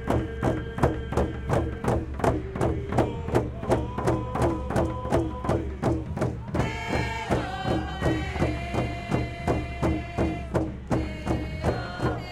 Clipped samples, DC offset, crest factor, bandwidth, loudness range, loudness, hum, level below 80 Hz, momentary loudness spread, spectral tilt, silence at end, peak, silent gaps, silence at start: under 0.1%; under 0.1%; 20 dB; 13 kHz; 2 LU; -28 LUFS; none; -36 dBFS; 3 LU; -7 dB/octave; 0 s; -8 dBFS; none; 0 s